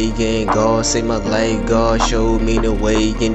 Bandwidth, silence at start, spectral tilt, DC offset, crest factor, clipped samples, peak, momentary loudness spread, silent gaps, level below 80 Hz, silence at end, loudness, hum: 8.6 kHz; 0 s; -4.5 dB/octave; under 0.1%; 14 dB; under 0.1%; -2 dBFS; 3 LU; none; -24 dBFS; 0 s; -16 LUFS; none